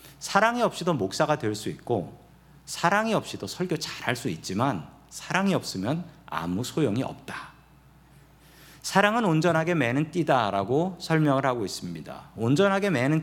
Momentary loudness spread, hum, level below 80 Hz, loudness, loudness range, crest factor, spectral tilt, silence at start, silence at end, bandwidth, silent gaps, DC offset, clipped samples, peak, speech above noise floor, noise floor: 14 LU; none; -60 dBFS; -26 LUFS; 5 LU; 22 dB; -5.5 dB/octave; 0.05 s; 0 s; 17.5 kHz; none; under 0.1%; under 0.1%; -4 dBFS; 29 dB; -55 dBFS